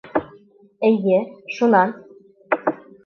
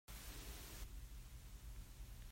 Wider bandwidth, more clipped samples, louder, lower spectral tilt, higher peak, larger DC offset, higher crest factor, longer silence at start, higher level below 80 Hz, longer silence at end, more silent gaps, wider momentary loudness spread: second, 6.6 kHz vs 16 kHz; neither; first, -20 LUFS vs -56 LUFS; first, -7.5 dB/octave vs -3.5 dB/octave; first, -4 dBFS vs -38 dBFS; neither; about the same, 18 dB vs 14 dB; about the same, 0.05 s vs 0.1 s; second, -64 dBFS vs -54 dBFS; first, 0.3 s vs 0 s; neither; first, 10 LU vs 5 LU